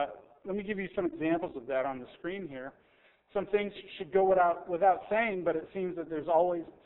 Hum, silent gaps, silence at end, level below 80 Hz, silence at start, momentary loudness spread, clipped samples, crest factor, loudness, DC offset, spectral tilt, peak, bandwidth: none; none; 0.15 s; -64 dBFS; 0 s; 13 LU; under 0.1%; 18 dB; -31 LUFS; under 0.1%; -4.5 dB/octave; -14 dBFS; 4 kHz